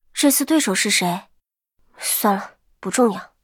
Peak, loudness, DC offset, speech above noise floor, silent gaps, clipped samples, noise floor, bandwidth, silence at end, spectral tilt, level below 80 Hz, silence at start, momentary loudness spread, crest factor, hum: -4 dBFS; -19 LUFS; under 0.1%; 46 dB; none; under 0.1%; -65 dBFS; 19 kHz; 0.15 s; -3 dB/octave; -64 dBFS; 0.15 s; 12 LU; 18 dB; none